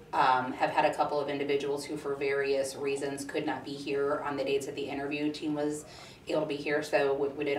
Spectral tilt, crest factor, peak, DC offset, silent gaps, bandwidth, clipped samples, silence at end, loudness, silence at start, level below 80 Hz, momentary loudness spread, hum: -4.5 dB/octave; 18 dB; -12 dBFS; under 0.1%; none; 14.5 kHz; under 0.1%; 0 s; -31 LUFS; 0 s; -66 dBFS; 8 LU; none